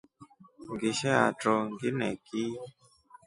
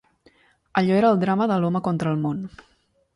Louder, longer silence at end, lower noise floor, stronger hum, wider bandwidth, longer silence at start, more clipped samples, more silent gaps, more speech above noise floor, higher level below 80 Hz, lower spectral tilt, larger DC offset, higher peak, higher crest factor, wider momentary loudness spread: second, -30 LUFS vs -22 LUFS; second, 0.55 s vs 0.7 s; about the same, -58 dBFS vs -59 dBFS; neither; about the same, 11.5 kHz vs 11 kHz; second, 0.2 s vs 0.75 s; neither; neither; second, 29 dB vs 38 dB; second, -68 dBFS vs -60 dBFS; second, -5 dB/octave vs -8.5 dB/octave; neither; second, -8 dBFS vs -4 dBFS; about the same, 24 dB vs 20 dB; first, 17 LU vs 10 LU